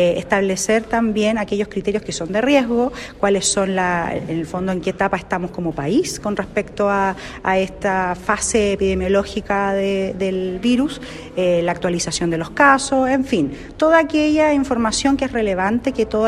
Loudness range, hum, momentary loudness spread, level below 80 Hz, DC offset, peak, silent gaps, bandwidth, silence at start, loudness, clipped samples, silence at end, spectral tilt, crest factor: 4 LU; none; 8 LU; -40 dBFS; under 0.1%; -2 dBFS; none; 13.5 kHz; 0 s; -19 LUFS; under 0.1%; 0 s; -4.5 dB/octave; 16 dB